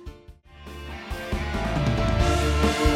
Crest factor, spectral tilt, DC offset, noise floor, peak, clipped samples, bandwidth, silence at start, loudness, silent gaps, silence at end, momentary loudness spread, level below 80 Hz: 16 dB; -5.5 dB/octave; under 0.1%; -47 dBFS; -8 dBFS; under 0.1%; 15.5 kHz; 0 s; -25 LUFS; none; 0 s; 20 LU; -28 dBFS